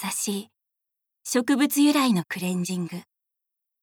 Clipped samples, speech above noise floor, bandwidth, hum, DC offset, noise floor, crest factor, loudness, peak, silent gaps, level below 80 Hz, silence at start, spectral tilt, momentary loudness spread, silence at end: under 0.1%; 61 dB; 19.5 kHz; none; under 0.1%; -84 dBFS; 16 dB; -24 LUFS; -10 dBFS; none; -80 dBFS; 0 s; -4 dB/octave; 15 LU; 0.8 s